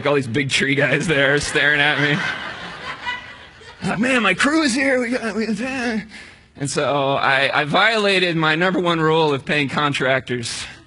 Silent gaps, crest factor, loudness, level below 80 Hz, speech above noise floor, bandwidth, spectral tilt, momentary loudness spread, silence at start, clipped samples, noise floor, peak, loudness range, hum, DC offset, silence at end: none; 18 dB; -18 LUFS; -50 dBFS; 22 dB; 11 kHz; -4 dB/octave; 12 LU; 0 s; under 0.1%; -41 dBFS; -2 dBFS; 3 LU; none; under 0.1%; 0.05 s